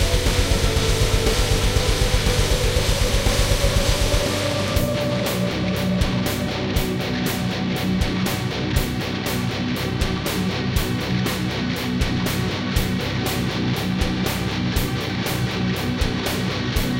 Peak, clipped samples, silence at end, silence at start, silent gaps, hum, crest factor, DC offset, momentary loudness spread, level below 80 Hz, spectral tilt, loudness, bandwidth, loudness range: -6 dBFS; under 0.1%; 0 s; 0 s; none; none; 16 dB; under 0.1%; 4 LU; -26 dBFS; -4.5 dB/octave; -22 LUFS; 17 kHz; 3 LU